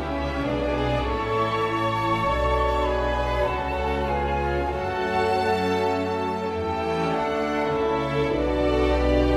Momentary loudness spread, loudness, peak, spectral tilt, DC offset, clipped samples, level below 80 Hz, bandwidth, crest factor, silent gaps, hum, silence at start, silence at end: 4 LU; -24 LUFS; -10 dBFS; -6.5 dB/octave; under 0.1%; under 0.1%; -32 dBFS; 12.5 kHz; 14 dB; none; none; 0 s; 0 s